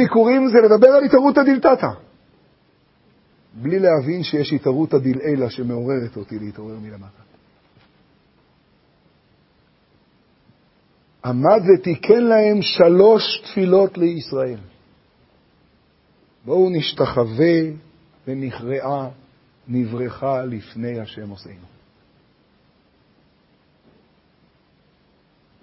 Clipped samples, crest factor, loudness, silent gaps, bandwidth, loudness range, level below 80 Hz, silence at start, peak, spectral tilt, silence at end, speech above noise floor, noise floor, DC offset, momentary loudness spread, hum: under 0.1%; 20 dB; -17 LUFS; none; 5.8 kHz; 15 LU; -58 dBFS; 0 s; 0 dBFS; -9.5 dB/octave; 4.1 s; 42 dB; -59 dBFS; under 0.1%; 20 LU; none